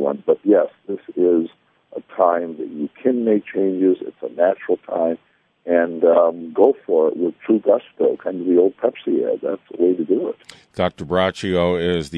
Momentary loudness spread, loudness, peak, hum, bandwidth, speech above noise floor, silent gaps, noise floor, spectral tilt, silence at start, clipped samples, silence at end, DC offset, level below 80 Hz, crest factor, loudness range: 12 LU; -19 LUFS; 0 dBFS; none; 11 kHz; 23 dB; none; -42 dBFS; -7 dB/octave; 0 s; under 0.1%; 0 s; under 0.1%; -56 dBFS; 18 dB; 3 LU